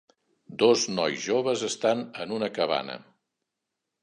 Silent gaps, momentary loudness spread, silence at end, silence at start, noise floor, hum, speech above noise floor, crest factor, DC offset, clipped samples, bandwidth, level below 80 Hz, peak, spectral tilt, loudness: none; 13 LU; 1.05 s; 0.5 s; -84 dBFS; none; 58 dB; 22 dB; under 0.1%; under 0.1%; 11 kHz; -76 dBFS; -6 dBFS; -3.5 dB/octave; -26 LUFS